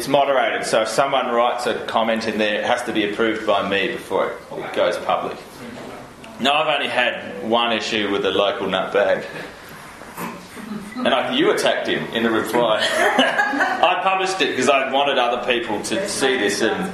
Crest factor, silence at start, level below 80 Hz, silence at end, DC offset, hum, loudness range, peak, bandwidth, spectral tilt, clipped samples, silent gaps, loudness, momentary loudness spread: 20 dB; 0 s; -58 dBFS; 0 s; under 0.1%; none; 5 LU; 0 dBFS; 13 kHz; -3 dB/octave; under 0.1%; none; -19 LUFS; 15 LU